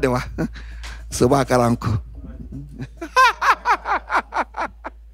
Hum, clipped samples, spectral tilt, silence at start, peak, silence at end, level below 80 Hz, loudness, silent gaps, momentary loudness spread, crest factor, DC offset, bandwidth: none; under 0.1%; -5 dB/octave; 0 s; -4 dBFS; 0.05 s; -36 dBFS; -20 LUFS; none; 20 LU; 18 dB; under 0.1%; 16 kHz